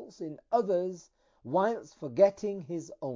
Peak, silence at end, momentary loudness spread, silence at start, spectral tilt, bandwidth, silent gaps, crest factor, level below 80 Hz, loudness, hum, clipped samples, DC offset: -10 dBFS; 0 s; 16 LU; 0 s; -7 dB/octave; 7.6 kHz; none; 20 dB; -74 dBFS; -30 LUFS; none; under 0.1%; under 0.1%